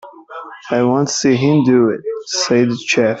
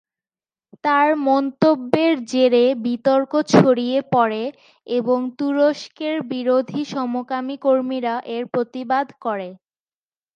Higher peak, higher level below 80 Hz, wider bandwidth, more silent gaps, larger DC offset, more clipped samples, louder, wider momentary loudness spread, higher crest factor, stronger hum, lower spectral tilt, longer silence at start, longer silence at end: about the same, -2 dBFS vs 0 dBFS; first, -58 dBFS vs -66 dBFS; second, 8 kHz vs 9.2 kHz; neither; neither; neither; first, -15 LUFS vs -20 LUFS; first, 19 LU vs 10 LU; second, 12 dB vs 20 dB; neither; about the same, -5 dB/octave vs -6 dB/octave; second, 0.05 s vs 0.85 s; second, 0 s vs 0.8 s